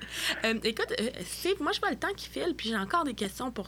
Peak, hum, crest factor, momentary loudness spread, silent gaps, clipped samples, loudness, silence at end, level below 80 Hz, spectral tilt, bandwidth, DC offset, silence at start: -12 dBFS; none; 18 dB; 5 LU; none; under 0.1%; -31 LUFS; 0 s; -54 dBFS; -3 dB/octave; over 20 kHz; under 0.1%; 0 s